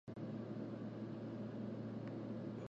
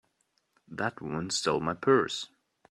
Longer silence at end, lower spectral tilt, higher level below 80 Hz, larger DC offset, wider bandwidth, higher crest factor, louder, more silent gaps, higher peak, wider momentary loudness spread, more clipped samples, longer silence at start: second, 0 s vs 0.45 s; first, -9 dB/octave vs -4 dB/octave; second, -76 dBFS vs -66 dBFS; neither; second, 7.6 kHz vs 11 kHz; second, 12 dB vs 20 dB; second, -47 LUFS vs -29 LUFS; neither; second, -34 dBFS vs -12 dBFS; second, 1 LU vs 13 LU; neither; second, 0.05 s vs 0.7 s